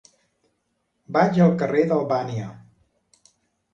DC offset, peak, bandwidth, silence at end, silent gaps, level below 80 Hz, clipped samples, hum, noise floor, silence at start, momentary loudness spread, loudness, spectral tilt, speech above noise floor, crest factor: under 0.1%; -4 dBFS; 7.4 kHz; 1.15 s; none; -62 dBFS; under 0.1%; none; -73 dBFS; 1.1 s; 14 LU; -21 LUFS; -8.5 dB/octave; 53 dB; 20 dB